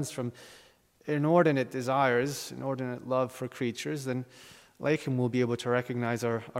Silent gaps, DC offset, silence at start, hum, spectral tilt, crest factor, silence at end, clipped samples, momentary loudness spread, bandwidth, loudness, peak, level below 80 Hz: none; under 0.1%; 0 s; none; -6 dB/octave; 20 dB; 0 s; under 0.1%; 11 LU; 16 kHz; -30 LUFS; -10 dBFS; -72 dBFS